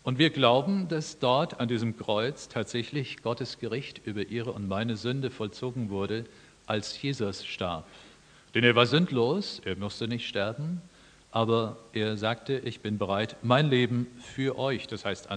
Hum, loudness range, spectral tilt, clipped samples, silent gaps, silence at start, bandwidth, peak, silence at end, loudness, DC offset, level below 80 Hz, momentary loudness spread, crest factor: none; 5 LU; -6 dB/octave; under 0.1%; none; 0.05 s; 10 kHz; -4 dBFS; 0 s; -29 LUFS; under 0.1%; -64 dBFS; 11 LU; 24 dB